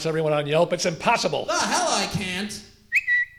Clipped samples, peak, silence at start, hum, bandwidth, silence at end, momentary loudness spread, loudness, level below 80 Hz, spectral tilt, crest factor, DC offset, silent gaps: under 0.1%; -6 dBFS; 0 s; none; 18.5 kHz; 0.1 s; 7 LU; -22 LUFS; -54 dBFS; -3 dB/octave; 18 dB; under 0.1%; none